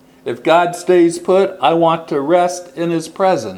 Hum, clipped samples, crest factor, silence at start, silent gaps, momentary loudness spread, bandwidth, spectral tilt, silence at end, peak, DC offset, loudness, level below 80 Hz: none; under 0.1%; 14 dB; 0.25 s; none; 7 LU; 13 kHz; -5.5 dB/octave; 0 s; 0 dBFS; under 0.1%; -15 LUFS; -64 dBFS